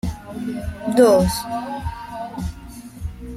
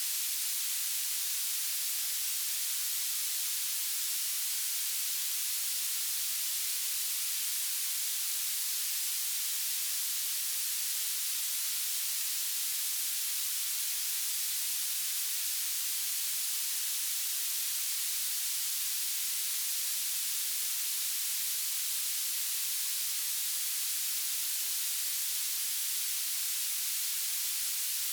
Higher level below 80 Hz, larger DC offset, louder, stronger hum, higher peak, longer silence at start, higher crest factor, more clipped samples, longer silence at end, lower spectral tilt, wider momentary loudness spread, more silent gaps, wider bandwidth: first, -36 dBFS vs under -90 dBFS; neither; first, -21 LUFS vs -30 LUFS; neither; first, -2 dBFS vs -18 dBFS; about the same, 0.05 s vs 0 s; first, 20 dB vs 14 dB; neither; about the same, 0 s vs 0 s; first, -6 dB/octave vs 9.5 dB/octave; first, 19 LU vs 0 LU; neither; second, 16 kHz vs over 20 kHz